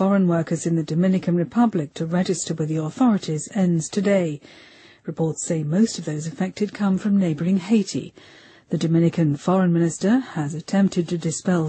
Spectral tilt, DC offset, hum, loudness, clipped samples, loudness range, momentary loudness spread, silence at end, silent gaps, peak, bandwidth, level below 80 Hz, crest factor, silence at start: -6.5 dB/octave; under 0.1%; none; -22 LUFS; under 0.1%; 2 LU; 8 LU; 0 s; none; -6 dBFS; 8.8 kHz; -62 dBFS; 14 dB; 0 s